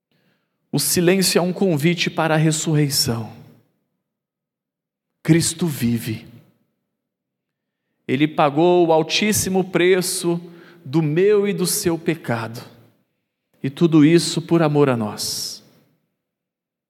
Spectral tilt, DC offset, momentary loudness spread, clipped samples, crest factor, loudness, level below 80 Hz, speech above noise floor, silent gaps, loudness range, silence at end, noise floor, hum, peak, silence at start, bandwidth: -4.5 dB/octave; under 0.1%; 13 LU; under 0.1%; 20 dB; -18 LUFS; -58 dBFS; 67 dB; none; 6 LU; 1.3 s; -85 dBFS; none; -2 dBFS; 0.75 s; 16.5 kHz